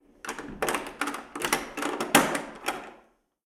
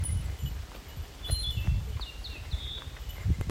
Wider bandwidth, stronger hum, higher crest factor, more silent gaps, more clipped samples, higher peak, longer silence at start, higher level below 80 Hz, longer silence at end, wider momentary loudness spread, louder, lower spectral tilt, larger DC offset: first, 19 kHz vs 16 kHz; neither; first, 26 dB vs 18 dB; neither; neither; first, -4 dBFS vs -14 dBFS; first, 0.25 s vs 0 s; second, -58 dBFS vs -36 dBFS; first, 0.45 s vs 0 s; first, 16 LU vs 11 LU; first, -28 LUFS vs -35 LUFS; second, -2 dB/octave vs -4 dB/octave; neither